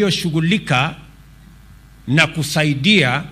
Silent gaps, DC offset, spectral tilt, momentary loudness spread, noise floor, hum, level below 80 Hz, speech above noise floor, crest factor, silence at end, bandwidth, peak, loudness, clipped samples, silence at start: none; under 0.1%; -5 dB/octave; 6 LU; -43 dBFS; none; -46 dBFS; 27 dB; 18 dB; 0 s; 15.5 kHz; 0 dBFS; -16 LUFS; under 0.1%; 0 s